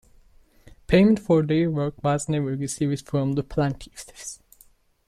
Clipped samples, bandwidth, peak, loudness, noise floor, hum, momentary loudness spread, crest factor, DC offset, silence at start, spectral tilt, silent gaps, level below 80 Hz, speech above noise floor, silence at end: under 0.1%; 14.5 kHz; -6 dBFS; -23 LUFS; -57 dBFS; none; 19 LU; 20 dB; under 0.1%; 0.9 s; -6.5 dB/octave; none; -46 dBFS; 34 dB; 0.7 s